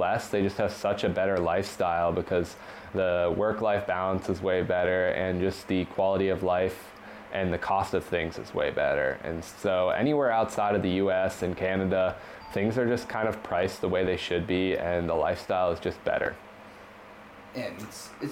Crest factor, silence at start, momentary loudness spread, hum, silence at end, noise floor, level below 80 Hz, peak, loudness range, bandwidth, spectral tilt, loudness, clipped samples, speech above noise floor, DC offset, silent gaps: 12 dB; 0 s; 12 LU; none; 0 s; -48 dBFS; -54 dBFS; -16 dBFS; 2 LU; 16.5 kHz; -6 dB/octave; -28 LUFS; under 0.1%; 20 dB; under 0.1%; none